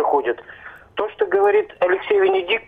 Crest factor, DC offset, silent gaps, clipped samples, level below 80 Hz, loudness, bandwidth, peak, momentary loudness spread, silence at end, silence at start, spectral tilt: 12 dB; under 0.1%; none; under 0.1%; -60 dBFS; -19 LUFS; 3.9 kHz; -8 dBFS; 15 LU; 0.05 s; 0 s; -5.5 dB/octave